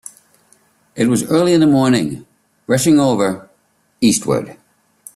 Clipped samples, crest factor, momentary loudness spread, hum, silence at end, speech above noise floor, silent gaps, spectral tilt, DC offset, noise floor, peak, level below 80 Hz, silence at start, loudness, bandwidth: under 0.1%; 14 dB; 22 LU; none; 0.6 s; 46 dB; none; -5 dB/octave; under 0.1%; -59 dBFS; -2 dBFS; -54 dBFS; 0.95 s; -15 LUFS; 14 kHz